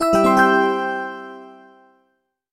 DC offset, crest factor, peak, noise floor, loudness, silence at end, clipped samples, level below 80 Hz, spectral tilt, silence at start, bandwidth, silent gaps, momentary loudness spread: under 0.1%; 18 dB; -2 dBFS; -69 dBFS; -17 LUFS; 1 s; under 0.1%; -52 dBFS; -5 dB/octave; 0 s; 16 kHz; none; 20 LU